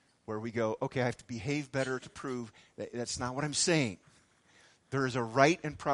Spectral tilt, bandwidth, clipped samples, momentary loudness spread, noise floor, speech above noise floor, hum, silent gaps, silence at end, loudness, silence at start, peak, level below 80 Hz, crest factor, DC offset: -4.5 dB/octave; 11.5 kHz; under 0.1%; 14 LU; -65 dBFS; 32 dB; none; none; 0 s; -33 LUFS; 0.3 s; -8 dBFS; -64 dBFS; 26 dB; under 0.1%